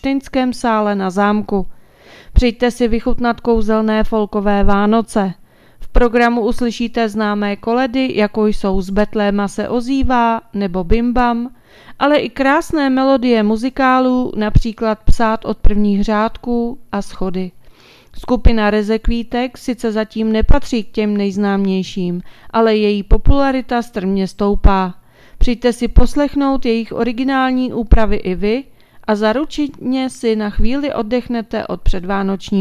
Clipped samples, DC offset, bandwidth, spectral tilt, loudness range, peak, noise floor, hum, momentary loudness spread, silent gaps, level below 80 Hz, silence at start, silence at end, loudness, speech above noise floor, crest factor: 0.2%; under 0.1%; 12 kHz; -6.5 dB/octave; 4 LU; 0 dBFS; -43 dBFS; none; 7 LU; none; -22 dBFS; 0.05 s; 0 s; -16 LUFS; 29 dB; 14 dB